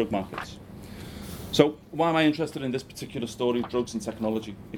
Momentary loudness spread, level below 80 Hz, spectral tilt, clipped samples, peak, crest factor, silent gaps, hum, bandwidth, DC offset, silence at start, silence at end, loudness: 17 LU; -52 dBFS; -5.5 dB/octave; under 0.1%; -2 dBFS; 26 dB; none; none; 19 kHz; under 0.1%; 0 s; 0 s; -27 LUFS